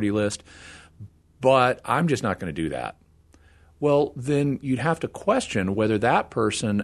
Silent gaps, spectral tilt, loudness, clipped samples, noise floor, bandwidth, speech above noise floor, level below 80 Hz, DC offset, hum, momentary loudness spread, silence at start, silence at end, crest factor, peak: none; -5.5 dB/octave; -24 LUFS; under 0.1%; -55 dBFS; 12.5 kHz; 32 dB; -54 dBFS; under 0.1%; none; 11 LU; 0 s; 0 s; 20 dB; -4 dBFS